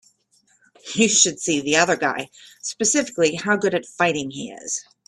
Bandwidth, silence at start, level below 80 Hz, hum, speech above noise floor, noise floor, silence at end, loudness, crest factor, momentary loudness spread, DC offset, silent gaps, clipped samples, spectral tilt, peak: 13 kHz; 0.85 s; -64 dBFS; none; 41 dB; -62 dBFS; 0.25 s; -20 LUFS; 20 dB; 15 LU; under 0.1%; none; under 0.1%; -2 dB/octave; -2 dBFS